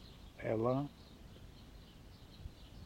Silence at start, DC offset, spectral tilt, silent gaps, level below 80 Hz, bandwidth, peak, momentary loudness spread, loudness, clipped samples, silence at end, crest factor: 0 s; under 0.1%; -8 dB/octave; none; -58 dBFS; 16 kHz; -22 dBFS; 22 LU; -38 LUFS; under 0.1%; 0 s; 20 dB